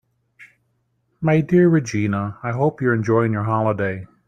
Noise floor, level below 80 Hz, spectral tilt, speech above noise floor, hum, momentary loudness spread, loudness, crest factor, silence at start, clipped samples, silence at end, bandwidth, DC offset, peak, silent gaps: -68 dBFS; -56 dBFS; -8 dB/octave; 49 dB; none; 9 LU; -19 LUFS; 16 dB; 0.4 s; under 0.1%; 0.2 s; 9.2 kHz; under 0.1%; -6 dBFS; none